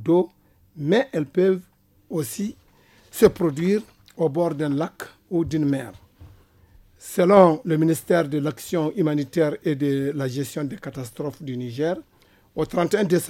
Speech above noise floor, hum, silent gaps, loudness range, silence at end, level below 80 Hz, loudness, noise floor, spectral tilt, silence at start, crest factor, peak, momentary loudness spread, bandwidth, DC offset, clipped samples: 34 dB; none; none; 6 LU; 0 s; -56 dBFS; -23 LUFS; -55 dBFS; -6.5 dB/octave; 0 s; 22 dB; 0 dBFS; 13 LU; 17 kHz; under 0.1%; under 0.1%